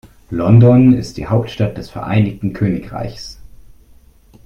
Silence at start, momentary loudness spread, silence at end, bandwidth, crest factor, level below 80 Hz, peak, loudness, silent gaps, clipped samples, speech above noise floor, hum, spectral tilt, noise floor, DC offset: 0.3 s; 18 LU; 1.15 s; 7 kHz; 14 dB; -40 dBFS; 0 dBFS; -14 LUFS; none; under 0.1%; 32 dB; none; -8.5 dB/octave; -46 dBFS; under 0.1%